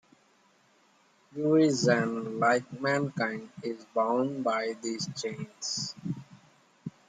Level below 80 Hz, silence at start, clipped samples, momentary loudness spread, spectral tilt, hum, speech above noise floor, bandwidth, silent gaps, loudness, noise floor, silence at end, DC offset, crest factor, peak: -74 dBFS; 1.35 s; under 0.1%; 14 LU; -4.5 dB/octave; none; 36 dB; 9.6 kHz; none; -29 LUFS; -65 dBFS; 0.2 s; under 0.1%; 20 dB; -12 dBFS